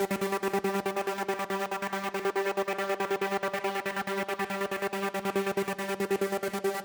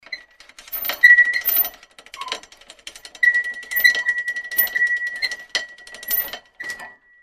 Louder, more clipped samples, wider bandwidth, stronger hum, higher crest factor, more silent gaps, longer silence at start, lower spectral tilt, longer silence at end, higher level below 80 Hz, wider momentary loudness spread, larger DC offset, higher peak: second, -31 LUFS vs -17 LUFS; neither; first, over 20 kHz vs 14.5 kHz; neither; second, 14 dB vs 22 dB; neither; about the same, 0 s vs 0.1 s; first, -4.5 dB/octave vs 1.5 dB/octave; second, 0 s vs 0.3 s; second, -70 dBFS vs -60 dBFS; second, 3 LU vs 22 LU; neither; second, -16 dBFS vs 0 dBFS